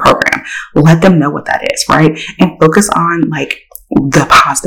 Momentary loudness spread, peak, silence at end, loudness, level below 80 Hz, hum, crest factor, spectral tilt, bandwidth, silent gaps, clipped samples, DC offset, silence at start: 9 LU; 0 dBFS; 0 s; -10 LUFS; -36 dBFS; none; 10 dB; -5 dB/octave; 18 kHz; none; 2%; under 0.1%; 0 s